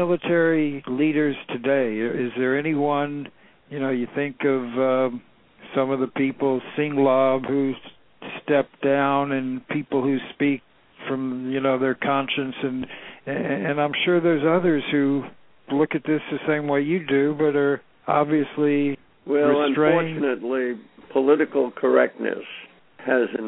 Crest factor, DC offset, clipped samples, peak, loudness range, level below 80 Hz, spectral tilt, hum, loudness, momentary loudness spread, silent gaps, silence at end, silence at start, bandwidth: 18 dB; under 0.1%; under 0.1%; -4 dBFS; 3 LU; -66 dBFS; -10.5 dB/octave; none; -23 LUFS; 10 LU; none; 0 s; 0 s; 4.1 kHz